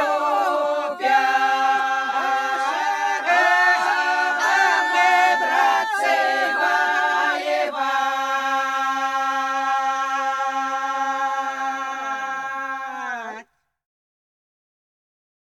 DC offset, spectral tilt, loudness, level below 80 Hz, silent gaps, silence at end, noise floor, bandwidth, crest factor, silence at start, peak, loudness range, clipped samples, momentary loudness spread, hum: under 0.1%; 0 dB/octave; -20 LUFS; -78 dBFS; none; 2 s; -45 dBFS; 14.5 kHz; 16 dB; 0 s; -6 dBFS; 10 LU; under 0.1%; 10 LU; none